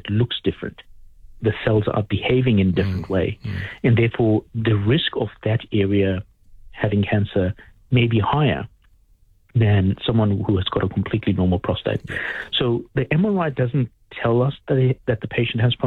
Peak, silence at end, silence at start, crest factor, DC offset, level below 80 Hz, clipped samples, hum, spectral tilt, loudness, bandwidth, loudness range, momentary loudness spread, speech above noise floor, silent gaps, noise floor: -6 dBFS; 0 s; 0.05 s; 14 dB; under 0.1%; -44 dBFS; under 0.1%; none; -9 dB/octave; -21 LUFS; 4.7 kHz; 2 LU; 8 LU; 35 dB; none; -55 dBFS